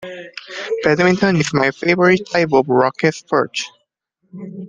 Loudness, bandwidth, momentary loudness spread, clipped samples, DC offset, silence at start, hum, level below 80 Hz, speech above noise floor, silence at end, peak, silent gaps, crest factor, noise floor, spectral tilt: -16 LUFS; 9.6 kHz; 17 LU; under 0.1%; under 0.1%; 0 s; none; -56 dBFS; 51 dB; 0 s; -2 dBFS; none; 16 dB; -67 dBFS; -5.5 dB/octave